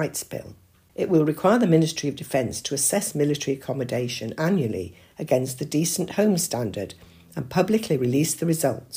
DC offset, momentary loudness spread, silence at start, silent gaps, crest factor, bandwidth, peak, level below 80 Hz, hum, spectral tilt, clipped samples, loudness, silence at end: under 0.1%; 14 LU; 0 s; none; 18 dB; 15.5 kHz; -6 dBFS; -60 dBFS; none; -5 dB/octave; under 0.1%; -24 LUFS; 0 s